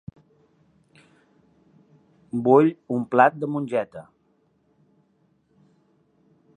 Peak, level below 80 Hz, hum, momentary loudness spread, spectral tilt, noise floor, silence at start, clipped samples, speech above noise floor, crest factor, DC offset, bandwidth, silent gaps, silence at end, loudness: -2 dBFS; -68 dBFS; none; 19 LU; -8.5 dB/octave; -66 dBFS; 2.35 s; under 0.1%; 45 dB; 24 dB; under 0.1%; 9.8 kHz; none; 2.55 s; -21 LUFS